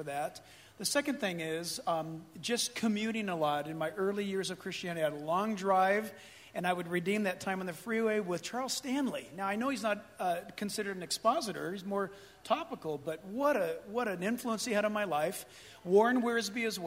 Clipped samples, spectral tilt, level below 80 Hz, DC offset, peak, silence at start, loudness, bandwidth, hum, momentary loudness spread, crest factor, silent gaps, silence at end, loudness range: under 0.1%; -4 dB/octave; -74 dBFS; under 0.1%; -14 dBFS; 0 s; -34 LUFS; 16 kHz; none; 9 LU; 20 dB; none; 0 s; 3 LU